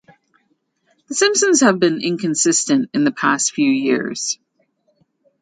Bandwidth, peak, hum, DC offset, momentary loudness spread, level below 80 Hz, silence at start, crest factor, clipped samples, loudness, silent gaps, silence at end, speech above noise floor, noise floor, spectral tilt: 9.6 kHz; 0 dBFS; none; under 0.1%; 9 LU; -66 dBFS; 1.1 s; 18 dB; under 0.1%; -17 LUFS; none; 1.05 s; 49 dB; -66 dBFS; -3 dB/octave